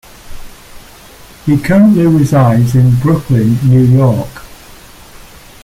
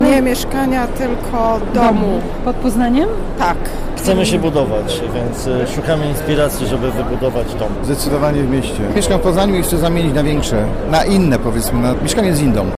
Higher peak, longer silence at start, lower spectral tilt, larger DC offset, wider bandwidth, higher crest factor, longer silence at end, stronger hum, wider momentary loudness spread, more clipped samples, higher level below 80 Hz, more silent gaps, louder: about the same, -2 dBFS vs -4 dBFS; first, 0.25 s vs 0 s; first, -8.5 dB/octave vs -5.5 dB/octave; neither; about the same, 15.5 kHz vs 15.5 kHz; about the same, 10 dB vs 10 dB; first, 1.1 s vs 0 s; neither; about the same, 7 LU vs 6 LU; neither; second, -36 dBFS vs -24 dBFS; neither; first, -10 LUFS vs -16 LUFS